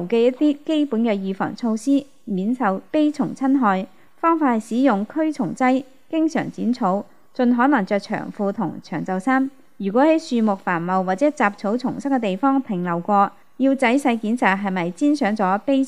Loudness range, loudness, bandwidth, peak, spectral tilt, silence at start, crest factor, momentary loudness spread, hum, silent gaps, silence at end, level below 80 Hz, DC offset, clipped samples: 2 LU; -21 LUFS; 11 kHz; -2 dBFS; -6.5 dB/octave; 0 s; 18 dB; 7 LU; none; none; 0 s; -72 dBFS; 0.4%; under 0.1%